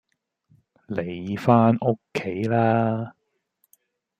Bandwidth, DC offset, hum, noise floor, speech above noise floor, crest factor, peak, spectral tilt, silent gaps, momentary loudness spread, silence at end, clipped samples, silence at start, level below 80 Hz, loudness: 8.2 kHz; under 0.1%; none; -71 dBFS; 49 dB; 22 dB; -2 dBFS; -8.5 dB/octave; none; 13 LU; 1.1 s; under 0.1%; 0.9 s; -64 dBFS; -23 LUFS